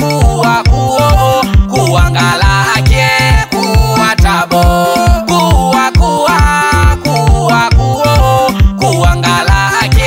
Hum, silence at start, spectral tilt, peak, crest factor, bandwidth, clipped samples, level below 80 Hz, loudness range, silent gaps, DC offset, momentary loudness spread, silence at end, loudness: none; 0 s; -5 dB/octave; 0 dBFS; 8 dB; 16.5 kHz; under 0.1%; -14 dBFS; 0 LU; none; under 0.1%; 2 LU; 0 s; -9 LUFS